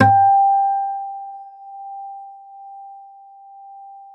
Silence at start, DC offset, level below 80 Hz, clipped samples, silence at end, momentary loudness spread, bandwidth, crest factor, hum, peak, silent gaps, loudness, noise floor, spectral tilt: 0 s; under 0.1%; -68 dBFS; under 0.1%; 0.15 s; 26 LU; 4.1 kHz; 20 dB; none; 0 dBFS; none; -17 LUFS; -43 dBFS; -8 dB/octave